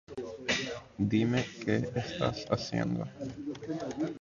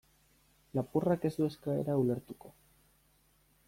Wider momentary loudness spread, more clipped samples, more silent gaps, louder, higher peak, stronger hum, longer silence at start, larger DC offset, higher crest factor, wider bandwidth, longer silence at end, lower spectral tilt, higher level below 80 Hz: about the same, 10 LU vs 10 LU; neither; neither; about the same, -33 LUFS vs -34 LUFS; first, -14 dBFS vs -18 dBFS; neither; second, 0.1 s vs 0.75 s; neither; about the same, 20 dB vs 18 dB; second, 7.6 kHz vs 16.5 kHz; second, 0 s vs 1.15 s; second, -5.5 dB/octave vs -8.5 dB/octave; first, -58 dBFS vs -66 dBFS